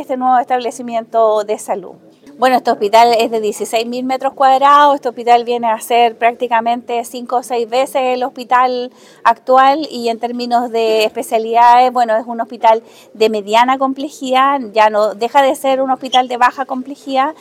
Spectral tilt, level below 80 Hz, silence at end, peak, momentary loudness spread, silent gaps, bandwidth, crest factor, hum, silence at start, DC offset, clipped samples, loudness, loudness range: -3 dB/octave; -66 dBFS; 0.1 s; 0 dBFS; 10 LU; none; 16 kHz; 14 dB; none; 0 s; under 0.1%; under 0.1%; -14 LUFS; 3 LU